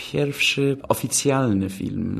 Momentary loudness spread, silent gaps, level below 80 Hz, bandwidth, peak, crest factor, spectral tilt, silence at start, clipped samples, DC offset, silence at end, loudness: 6 LU; none; -54 dBFS; 13 kHz; -4 dBFS; 18 dB; -4 dB/octave; 0 s; under 0.1%; under 0.1%; 0 s; -21 LUFS